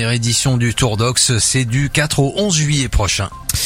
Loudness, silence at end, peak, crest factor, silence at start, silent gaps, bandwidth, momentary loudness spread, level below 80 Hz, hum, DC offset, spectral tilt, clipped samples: -15 LUFS; 0 s; 0 dBFS; 14 dB; 0 s; none; 16.5 kHz; 4 LU; -30 dBFS; none; under 0.1%; -3.5 dB/octave; under 0.1%